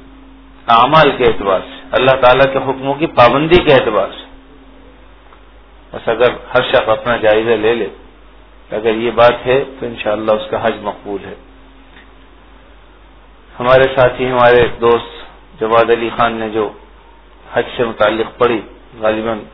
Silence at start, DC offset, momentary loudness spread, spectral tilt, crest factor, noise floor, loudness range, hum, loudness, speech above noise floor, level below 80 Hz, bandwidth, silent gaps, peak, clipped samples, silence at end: 0.65 s; under 0.1%; 14 LU; -7.5 dB/octave; 14 dB; -42 dBFS; 7 LU; none; -13 LUFS; 29 dB; -38 dBFS; 5.4 kHz; none; 0 dBFS; 0.3%; 0.05 s